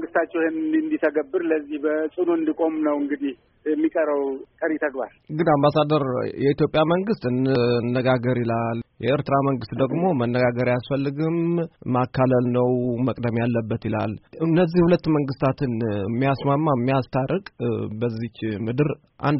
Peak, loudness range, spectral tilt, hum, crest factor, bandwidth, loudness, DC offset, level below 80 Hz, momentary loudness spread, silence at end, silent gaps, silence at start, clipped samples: -6 dBFS; 2 LU; -6.5 dB/octave; none; 16 dB; 5.8 kHz; -23 LUFS; under 0.1%; -54 dBFS; 8 LU; 0 s; none; 0 s; under 0.1%